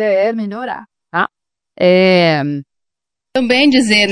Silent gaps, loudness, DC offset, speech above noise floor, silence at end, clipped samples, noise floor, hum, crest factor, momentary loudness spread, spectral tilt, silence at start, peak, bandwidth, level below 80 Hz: none; -13 LUFS; under 0.1%; 70 dB; 0 s; under 0.1%; -83 dBFS; none; 14 dB; 14 LU; -5 dB/octave; 0 s; 0 dBFS; 10.5 kHz; -56 dBFS